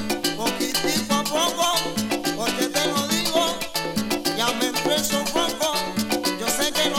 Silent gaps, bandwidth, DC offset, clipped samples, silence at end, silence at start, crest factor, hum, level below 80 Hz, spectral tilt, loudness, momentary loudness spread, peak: none; 17.5 kHz; under 0.1%; under 0.1%; 0 s; 0 s; 16 dB; none; -50 dBFS; -2.5 dB/octave; -22 LUFS; 4 LU; -6 dBFS